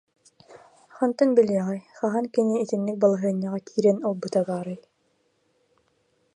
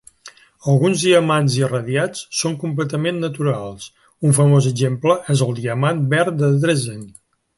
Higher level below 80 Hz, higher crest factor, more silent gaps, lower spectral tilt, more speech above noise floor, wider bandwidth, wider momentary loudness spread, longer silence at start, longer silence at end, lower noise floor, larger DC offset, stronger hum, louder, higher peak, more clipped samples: second, -76 dBFS vs -58 dBFS; about the same, 20 dB vs 16 dB; neither; first, -7.5 dB/octave vs -5.5 dB/octave; first, 46 dB vs 28 dB; about the same, 11 kHz vs 11.5 kHz; about the same, 9 LU vs 10 LU; first, 0.5 s vs 0.25 s; first, 1.6 s vs 0.5 s; first, -69 dBFS vs -45 dBFS; neither; neither; second, -24 LUFS vs -18 LUFS; second, -6 dBFS vs -2 dBFS; neither